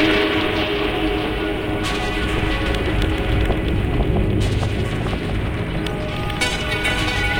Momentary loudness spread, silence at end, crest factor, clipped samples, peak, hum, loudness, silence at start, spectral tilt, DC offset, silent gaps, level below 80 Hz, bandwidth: 4 LU; 0 s; 16 dB; under 0.1%; -4 dBFS; none; -21 LUFS; 0 s; -5.5 dB/octave; under 0.1%; none; -26 dBFS; 17 kHz